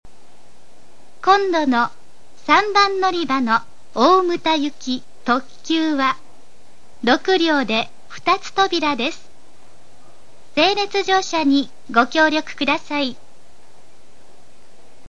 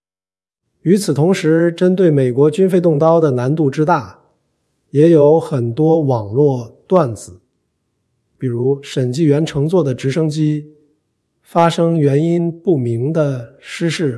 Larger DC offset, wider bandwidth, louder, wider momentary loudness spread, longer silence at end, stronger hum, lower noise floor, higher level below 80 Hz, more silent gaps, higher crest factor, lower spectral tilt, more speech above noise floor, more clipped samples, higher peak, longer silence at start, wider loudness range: first, 3% vs under 0.1%; second, 10.5 kHz vs 12 kHz; second, -18 LUFS vs -15 LUFS; about the same, 10 LU vs 8 LU; first, 1.95 s vs 0 s; neither; second, -53 dBFS vs under -90 dBFS; about the same, -60 dBFS vs -58 dBFS; neither; about the same, 20 dB vs 16 dB; second, -3 dB/octave vs -7.5 dB/octave; second, 35 dB vs over 76 dB; neither; about the same, 0 dBFS vs 0 dBFS; first, 1.25 s vs 0.85 s; about the same, 4 LU vs 5 LU